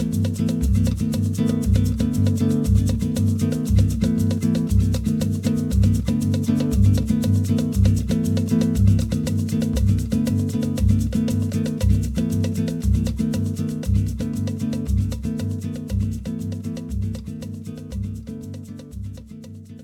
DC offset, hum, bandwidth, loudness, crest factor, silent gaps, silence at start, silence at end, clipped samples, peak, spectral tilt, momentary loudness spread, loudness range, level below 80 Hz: under 0.1%; none; 15.5 kHz; -22 LUFS; 16 dB; none; 0 s; 0 s; under 0.1%; -4 dBFS; -7.5 dB/octave; 12 LU; 8 LU; -28 dBFS